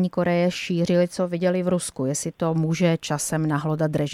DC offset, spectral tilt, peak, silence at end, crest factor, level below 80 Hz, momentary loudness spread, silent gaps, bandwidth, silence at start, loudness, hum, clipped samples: under 0.1%; -5.5 dB/octave; -8 dBFS; 0 s; 16 dB; -58 dBFS; 4 LU; none; 14.5 kHz; 0 s; -23 LUFS; none; under 0.1%